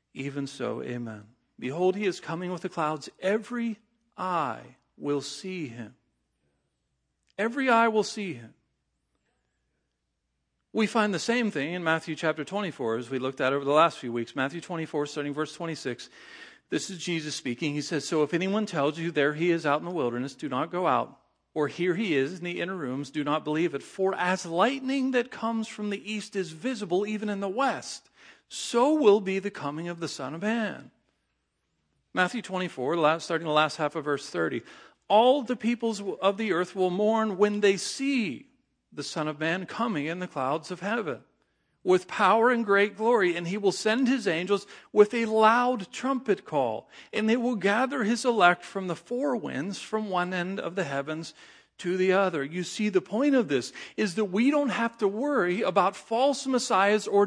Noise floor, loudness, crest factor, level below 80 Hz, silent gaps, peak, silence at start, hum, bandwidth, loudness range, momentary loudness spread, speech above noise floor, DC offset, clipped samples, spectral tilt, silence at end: -80 dBFS; -27 LUFS; 22 dB; -78 dBFS; none; -4 dBFS; 0.15 s; none; 10.5 kHz; 7 LU; 12 LU; 52 dB; under 0.1%; under 0.1%; -5 dB/octave; 0 s